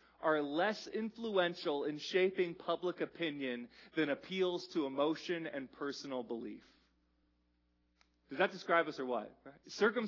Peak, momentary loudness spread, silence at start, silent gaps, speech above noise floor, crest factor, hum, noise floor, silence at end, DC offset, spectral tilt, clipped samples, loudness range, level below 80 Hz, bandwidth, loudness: -18 dBFS; 11 LU; 0.2 s; none; 40 dB; 20 dB; none; -77 dBFS; 0 s; under 0.1%; -3 dB/octave; under 0.1%; 6 LU; -80 dBFS; 6 kHz; -37 LUFS